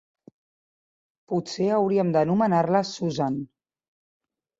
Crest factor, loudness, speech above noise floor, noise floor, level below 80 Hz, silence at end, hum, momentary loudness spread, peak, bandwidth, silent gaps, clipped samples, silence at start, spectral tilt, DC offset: 18 dB; -24 LUFS; over 67 dB; under -90 dBFS; -66 dBFS; 1.15 s; none; 9 LU; -8 dBFS; 7.8 kHz; none; under 0.1%; 1.3 s; -6.5 dB/octave; under 0.1%